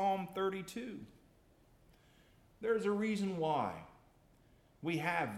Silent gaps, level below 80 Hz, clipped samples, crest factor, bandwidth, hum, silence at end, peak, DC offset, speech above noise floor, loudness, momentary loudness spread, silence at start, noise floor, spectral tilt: none; -72 dBFS; under 0.1%; 18 dB; 15.5 kHz; none; 0 s; -22 dBFS; under 0.1%; 30 dB; -37 LUFS; 16 LU; 0 s; -67 dBFS; -6 dB/octave